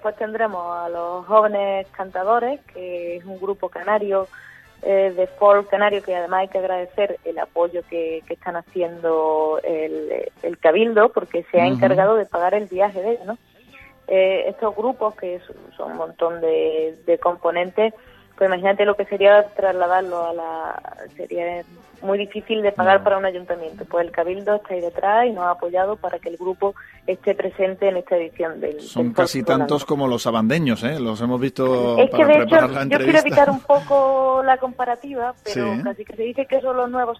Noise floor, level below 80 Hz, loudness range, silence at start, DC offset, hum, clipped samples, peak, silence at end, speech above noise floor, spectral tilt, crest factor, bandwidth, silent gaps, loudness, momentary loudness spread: -47 dBFS; -58 dBFS; 7 LU; 0.05 s; under 0.1%; none; under 0.1%; 0 dBFS; 0.05 s; 28 dB; -6 dB/octave; 18 dB; 14 kHz; none; -20 LUFS; 13 LU